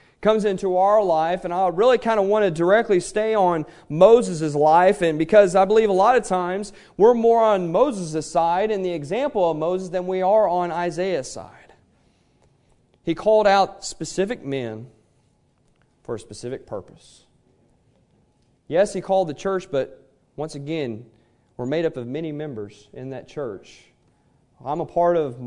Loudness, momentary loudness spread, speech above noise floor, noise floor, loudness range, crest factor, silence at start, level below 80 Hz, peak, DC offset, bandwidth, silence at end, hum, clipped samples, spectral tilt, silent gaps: -20 LUFS; 17 LU; 42 dB; -62 dBFS; 14 LU; 20 dB; 0.2 s; -54 dBFS; -2 dBFS; under 0.1%; 11 kHz; 0 s; none; under 0.1%; -5.5 dB/octave; none